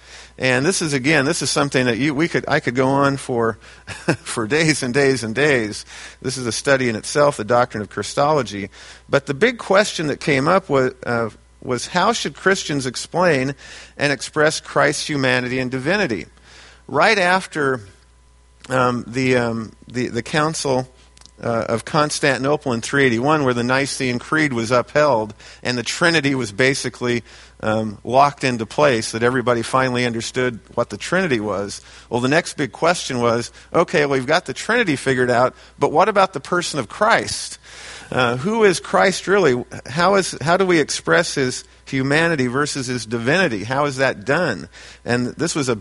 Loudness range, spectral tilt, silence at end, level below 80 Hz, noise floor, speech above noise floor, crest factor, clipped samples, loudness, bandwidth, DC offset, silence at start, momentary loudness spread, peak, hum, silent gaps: 3 LU; -4.5 dB/octave; 0 s; -50 dBFS; -51 dBFS; 32 dB; 18 dB; under 0.1%; -19 LUFS; 11.5 kHz; under 0.1%; 0.1 s; 9 LU; 0 dBFS; none; none